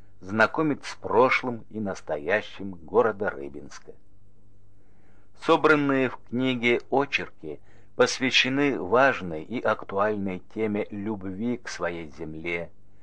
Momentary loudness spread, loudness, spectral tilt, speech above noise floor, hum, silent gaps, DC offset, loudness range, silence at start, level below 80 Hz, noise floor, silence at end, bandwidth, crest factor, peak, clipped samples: 17 LU; -25 LUFS; -4.5 dB/octave; 32 dB; none; none; 0.9%; 6 LU; 0.2 s; -60 dBFS; -58 dBFS; 0.35 s; 10 kHz; 20 dB; -6 dBFS; under 0.1%